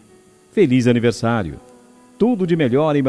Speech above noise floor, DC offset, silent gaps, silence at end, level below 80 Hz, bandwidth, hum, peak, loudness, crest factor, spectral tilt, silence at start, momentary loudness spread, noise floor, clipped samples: 34 dB; under 0.1%; none; 0 s; -50 dBFS; 11 kHz; none; -2 dBFS; -17 LUFS; 16 dB; -7 dB/octave; 0.55 s; 10 LU; -50 dBFS; under 0.1%